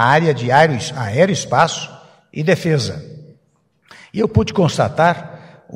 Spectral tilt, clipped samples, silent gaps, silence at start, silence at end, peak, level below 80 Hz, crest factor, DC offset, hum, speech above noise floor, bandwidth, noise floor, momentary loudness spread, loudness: -5.5 dB/octave; under 0.1%; none; 0 s; 0 s; 0 dBFS; -46 dBFS; 18 dB; under 0.1%; none; 45 dB; 12.5 kHz; -60 dBFS; 15 LU; -16 LUFS